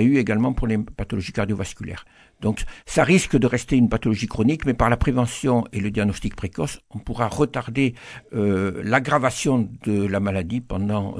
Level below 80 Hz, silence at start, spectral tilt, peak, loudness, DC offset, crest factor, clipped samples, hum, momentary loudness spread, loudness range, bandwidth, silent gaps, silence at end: -36 dBFS; 0 s; -6 dB/octave; -2 dBFS; -22 LUFS; under 0.1%; 20 dB; under 0.1%; none; 10 LU; 4 LU; 11 kHz; none; 0 s